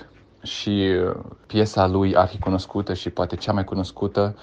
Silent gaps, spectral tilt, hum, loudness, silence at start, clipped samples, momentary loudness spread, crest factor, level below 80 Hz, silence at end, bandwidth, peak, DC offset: none; -6.5 dB/octave; none; -23 LUFS; 0 s; under 0.1%; 8 LU; 20 dB; -46 dBFS; 0 s; 8.6 kHz; -2 dBFS; under 0.1%